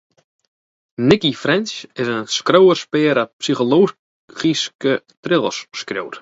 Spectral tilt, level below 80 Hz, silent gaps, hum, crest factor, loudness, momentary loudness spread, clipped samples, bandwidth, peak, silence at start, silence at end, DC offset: -4.5 dB/octave; -58 dBFS; 3.33-3.39 s, 3.99-4.28 s, 4.75-4.79 s, 5.17-5.23 s; none; 18 dB; -17 LUFS; 13 LU; under 0.1%; 8 kHz; 0 dBFS; 1 s; 0 s; under 0.1%